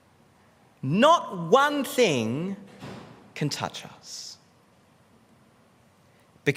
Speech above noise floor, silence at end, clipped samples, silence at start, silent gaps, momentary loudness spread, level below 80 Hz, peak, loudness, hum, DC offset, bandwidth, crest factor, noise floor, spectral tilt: 35 dB; 0 s; under 0.1%; 0.85 s; none; 22 LU; -72 dBFS; -6 dBFS; -24 LUFS; none; under 0.1%; 16 kHz; 22 dB; -59 dBFS; -4.5 dB/octave